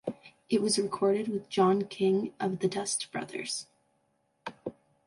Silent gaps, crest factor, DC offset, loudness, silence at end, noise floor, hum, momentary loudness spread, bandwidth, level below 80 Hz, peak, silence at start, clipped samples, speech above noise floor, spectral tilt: none; 18 dB; under 0.1%; -30 LUFS; 0.35 s; -74 dBFS; none; 17 LU; 11.5 kHz; -74 dBFS; -14 dBFS; 0.05 s; under 0.1%; 45 dB; -4.5 dB/octave